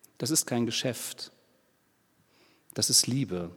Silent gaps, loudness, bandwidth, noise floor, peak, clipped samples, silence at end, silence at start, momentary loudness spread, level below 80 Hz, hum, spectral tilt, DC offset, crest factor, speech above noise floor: none; -27 LUFS; 19 kHz; -69 dBFS; -8 dBFS; under 0.1%; 0 s; 0.2 s; 19 LU; -70 dBFS; none; -3 dB/octave; under 0.1%; 24 dB; 40 dB